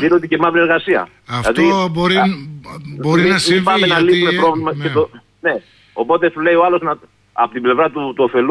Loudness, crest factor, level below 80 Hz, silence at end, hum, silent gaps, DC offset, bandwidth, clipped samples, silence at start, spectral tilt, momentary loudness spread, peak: -15 LUFS; 12 dB; -48 dBFS; 0 s; none; none; under 0.1%; 11 kHz; under 0.1%; 0 s; -5.5 dB/octave; 12 LU; -2 dBFS